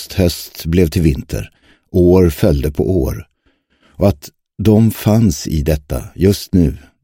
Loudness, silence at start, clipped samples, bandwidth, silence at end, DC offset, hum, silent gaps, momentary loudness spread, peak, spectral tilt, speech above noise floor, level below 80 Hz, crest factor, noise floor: -15 LUFS; 0 s; under 0.1%; 17 kHz; 0.25 s; under 0.1%; none; none; 14 LU; 0 dBFS; -7 dB/octave; 46 dB; -28 dBFS; 14 dB; -60 dBFS